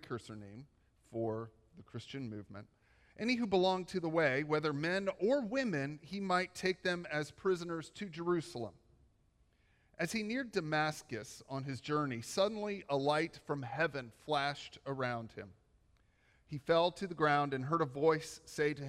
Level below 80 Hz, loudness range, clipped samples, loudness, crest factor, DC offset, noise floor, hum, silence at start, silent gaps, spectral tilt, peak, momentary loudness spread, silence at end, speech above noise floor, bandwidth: -70 dBFS; 6 LU; under 0.1%; -36 LUFS; 20 dB; under 0.1%; -72 dBFS; none; 0 s; none; -5.5 dB/octave; -18 dBFS; 15 LU; 0 s; 36 dB; 15 kHz